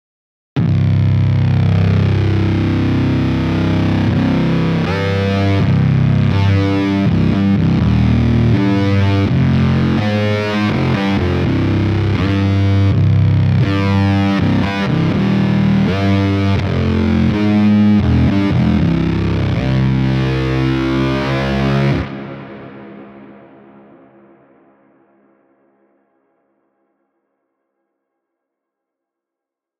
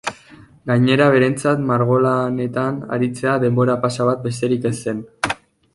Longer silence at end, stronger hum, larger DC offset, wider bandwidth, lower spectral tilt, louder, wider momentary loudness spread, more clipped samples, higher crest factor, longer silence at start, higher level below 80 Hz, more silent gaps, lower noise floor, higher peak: first, 6.5 s vs 0.4 s; neither; neither; second, 6.8 kHz vs 11.5 kHz; first, -8.5 dB/octave vs -6.5 dB/octave; first, -14 LUFS vs -18 LUFS; second, 3 LU vs 10 LU; neither; second, 12 dB vs 18 dB; first, 0.55 s vs 0.05 s; first, -30 dBFS vs -54 dBFS; neither; first, -84 dBFS vs -45 dBFS; about the same, -2 dBFS vs -2 dBFS